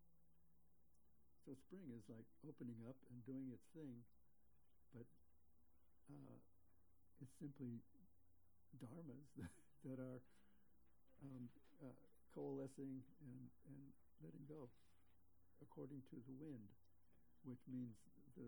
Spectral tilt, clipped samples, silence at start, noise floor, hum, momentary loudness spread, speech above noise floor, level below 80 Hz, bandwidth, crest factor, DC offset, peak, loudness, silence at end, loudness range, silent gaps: -8.5 dB/octave; under 0.1%; 0 s; -81 dBFS; none; 11 LU; 24 dB; -84 dBFS; over 20 kHz; 18 dB; under 0.1%; -42 dBFS; -59 LUFS; 0 s; 5 LU; none